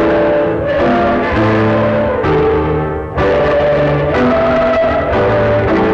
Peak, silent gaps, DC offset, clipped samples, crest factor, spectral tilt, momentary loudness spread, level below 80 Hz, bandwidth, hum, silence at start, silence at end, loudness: -6 dBFS; none; under 0.1%; under 0.1%; 6 dB; -8 dB/octave; 2 LU; -28 dBFS; 7.6 kHz; none; 0 s; 0 s; -13 LUFS